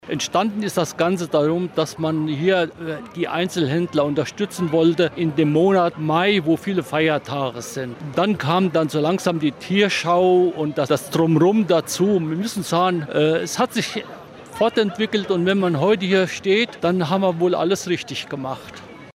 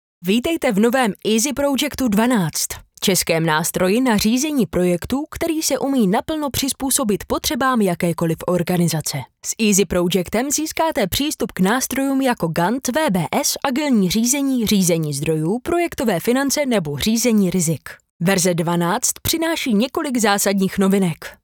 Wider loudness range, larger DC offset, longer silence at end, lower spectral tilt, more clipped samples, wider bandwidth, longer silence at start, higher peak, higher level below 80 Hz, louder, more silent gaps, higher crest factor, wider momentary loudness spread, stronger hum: about the same, 3 LU vs 1 LU; neither; about the same, 0.05 s vs 0.1 s; first, -5.5 dB/octave vs -4 dB/octave; neither; second, 16 kHz vs over 20 kHz; second, 0.05 s vs 0.2 s; second, -6 dBFS vs 0 dBFS; second, -60 dBFS vs -46 dBFS; about the same, -20 LUFS vs -19 LUFS; second, none vs 18.10-18.20 s; about the same, 14 dB vs 18 dB; first, 9 LU vs 5 LU; neither